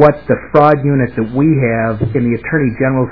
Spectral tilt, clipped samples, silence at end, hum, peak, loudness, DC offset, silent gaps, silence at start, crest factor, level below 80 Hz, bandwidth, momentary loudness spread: -11 dB/octave; 0.5%; 0 s; none; 0 dBFS; -13 LUFS; 1%; none; 0 s; 12 dB; -38 dBFS; 5.4 kHz; 6 LU